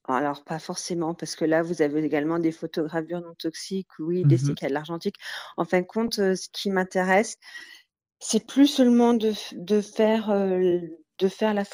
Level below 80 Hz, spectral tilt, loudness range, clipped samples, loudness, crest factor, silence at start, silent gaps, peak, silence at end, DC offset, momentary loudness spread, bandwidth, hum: -66 dBFS; -5.5 dB/octave; 4 LU; under 0.1%; -25 LUFS; 18 dB; 0.1 s; none; -8 dBFS; 0.05 s; under 0.1%; 12 LU; over 20 kHz; none